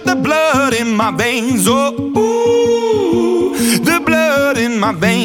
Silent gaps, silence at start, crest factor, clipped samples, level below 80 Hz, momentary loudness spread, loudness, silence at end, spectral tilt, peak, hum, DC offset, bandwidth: none; 0 s; 12 dB; under 0.1%; -46 dBFS; 3 LU; -13 LUFS; 0 s; -4 dB/octave; -2 dBFS; none; under 0.1%; 18.5 kHz